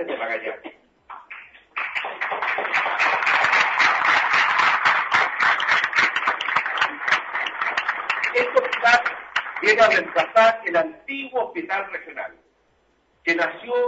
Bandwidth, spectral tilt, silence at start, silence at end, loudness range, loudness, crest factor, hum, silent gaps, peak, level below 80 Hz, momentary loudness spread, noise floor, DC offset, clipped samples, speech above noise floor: 8 kHz; -2 dB/octave; 0 s; 0 s; 6 LU; -20 LUFS; 18 dB; none; none; -4 dBFS; -68 dBFS; 13 LU; -63 dBFS; under 0.1%; under 0.1%; 42 dB